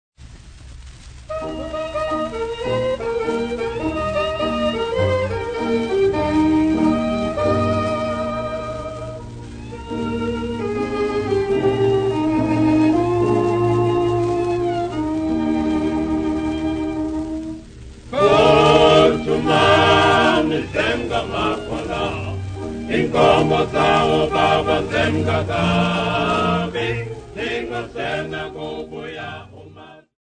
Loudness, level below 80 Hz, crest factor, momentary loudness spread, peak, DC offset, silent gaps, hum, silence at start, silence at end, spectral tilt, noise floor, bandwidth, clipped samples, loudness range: -19 LUFS; -38 dBFS; 18 dB; 14 LU; 0 dBFS; under 0.1%; none; none; 0.2 s; 0.3 s; -6 dB/octave; -42 dBFS; 9.6 kHz; under 0.1%; 9 LU